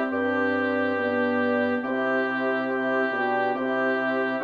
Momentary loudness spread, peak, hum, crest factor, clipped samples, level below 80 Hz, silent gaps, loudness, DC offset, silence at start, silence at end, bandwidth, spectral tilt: 2 LU; -12 dBFS; none; 12 dB; under 0.1%; -70 dBFS; none; -25 LUFS; under 0.1%; 0 s; 0 s; 6.6 kHz; -7 dB/octave